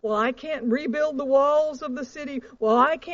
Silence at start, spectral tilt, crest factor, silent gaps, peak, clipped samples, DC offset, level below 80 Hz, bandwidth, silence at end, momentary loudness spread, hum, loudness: 0.05 s; -3 dB/octave; 16 dB; none; -6 dBFS; under 0.1%; under 0.1%; -60 dBFS; 7.6 kHz; 0 s; 13 LU; none; -24 LUFS